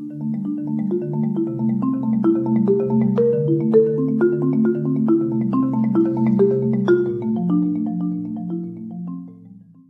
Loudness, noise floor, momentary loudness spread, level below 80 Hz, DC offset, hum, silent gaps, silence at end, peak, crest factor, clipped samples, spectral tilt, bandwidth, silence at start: -19 LUFS; -44 dBFS; 10 LU; -64 dBFS; under 0.1%; none; none; 0.3 s; -4 dBFS; 16 dB; under 0.1%; -11.5 dB/octave; 3.7 kHz; 0 s